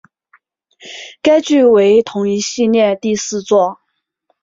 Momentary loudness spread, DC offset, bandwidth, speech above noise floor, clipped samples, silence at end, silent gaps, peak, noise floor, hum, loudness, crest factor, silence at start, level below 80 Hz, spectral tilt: 10 LU; under 0.1%; 7.8 kHz; 53 dB; under 0.1%; 0.7 s; none; 0 dBFS; -65 dBFS; none; -13 LUFS; 14 dB; 0.85 s; -58 dBFS; -4.5 dB/octave